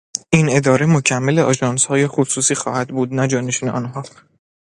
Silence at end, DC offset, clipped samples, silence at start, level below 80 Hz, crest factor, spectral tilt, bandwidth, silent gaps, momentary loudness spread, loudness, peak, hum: 0.6 s; under 0.1%; under 0.1%; 0.15 s; -54 dBFS; 18 dB; -4.5 dB/octave; 11.5 kHz; none; 9 LU; -17 LUFS; 0 dBFS; none